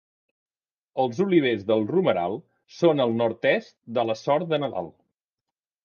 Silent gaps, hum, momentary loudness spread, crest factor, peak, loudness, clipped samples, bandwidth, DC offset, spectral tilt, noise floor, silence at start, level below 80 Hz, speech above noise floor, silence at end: none; none; 9 LU; 18 dB; -6 dBFS; -24 LUFS; under 0.1%; 7 kHz; under 0.1%; -7 dB/octave; -88 dBFS; 0.95 s; -68 dBFS; 65 dB; 0.95 s